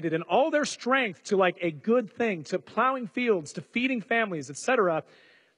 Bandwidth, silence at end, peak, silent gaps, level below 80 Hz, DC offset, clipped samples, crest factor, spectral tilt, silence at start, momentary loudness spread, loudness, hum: 11 kHz; 0.55 s; -10 dBFS; none; -76 dBFS; under 0.1%; under 0.1%; 18 dB; -4.5 dB/octave; 0 s; 7 LU; -27 LUFS; none